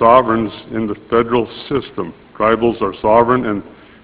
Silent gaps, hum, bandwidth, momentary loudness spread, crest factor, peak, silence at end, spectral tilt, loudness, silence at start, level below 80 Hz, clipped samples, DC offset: none; none; 4 kHz; 12 LU; 16 dB; 0 dBFS; 0.35 s; -10.5 dB/octave; -16 LUFS; 0 s; -44 dBFS; under 0.1%; under 0.1%